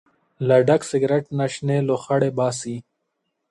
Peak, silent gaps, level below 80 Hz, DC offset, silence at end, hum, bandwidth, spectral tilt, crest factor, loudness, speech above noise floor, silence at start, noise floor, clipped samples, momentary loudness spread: -4 dBFS; none; -64 dBFS; under 0.1%; 0.7 s; none; 11.5 kHz; -6.5 dB/octave; 18 dB; -21 LUFS; 56 dB; 0.4 s; -76 dBFS; under 0.1%; 11 LU